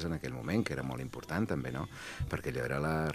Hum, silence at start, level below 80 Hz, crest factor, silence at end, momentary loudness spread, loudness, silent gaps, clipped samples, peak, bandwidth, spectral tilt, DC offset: none; 0 s; -52 dBFS; 18 dB; 0 s; 7 LU; -36 LUFS; none; under 0.1%; -18 dBFS; 15 kHz; -6.5 dB/octave; under 0.1%